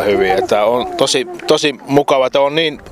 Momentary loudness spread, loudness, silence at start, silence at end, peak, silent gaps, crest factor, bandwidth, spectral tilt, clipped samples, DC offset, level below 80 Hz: 3 LU; -14 LUFS; 0 s; 0 s; 0 dBFS; none; 14 dB; 15 kHz; -3.5 dB/octave; under 0.1%; under 0.1%; -46 dBFS